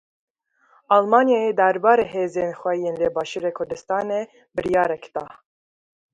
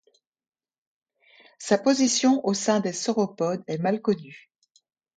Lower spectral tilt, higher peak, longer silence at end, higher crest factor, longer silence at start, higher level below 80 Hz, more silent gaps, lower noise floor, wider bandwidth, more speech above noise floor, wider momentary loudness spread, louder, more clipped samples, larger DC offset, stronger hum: first, -5.5 dB/octave vs -4 dB/octave; first, -2 dBFS vs -6 dBFS; about the same, 0.8 s vs 0.8 s; about the same, 20 dB vs 20 dB; second, 0.9 s vs 1.6 s; first, -60 dBFS vs -74 dBFS; neither; second, -60 dBFS vs -67 dBFS; about the same, 9.6 kHz vs 9.4 kHz; second, 40 dB vs 44 dB; first, 13 LU vs 8 LU; first, -21 LUFS vs -24 LUFS; neither; neither; neither